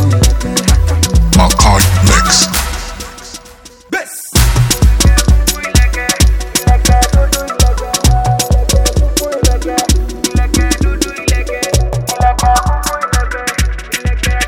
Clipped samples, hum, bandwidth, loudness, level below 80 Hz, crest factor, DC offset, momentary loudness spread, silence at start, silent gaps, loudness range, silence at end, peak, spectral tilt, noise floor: under 0.1%; none; over 20 kHz; -12 LUFS; -14 dBFS; 10 dB; under 0.1%; 9 LU; 0 s; none; 3 LU; 0 s; 0 dBFS; -4 dB/octave; -37 dBFS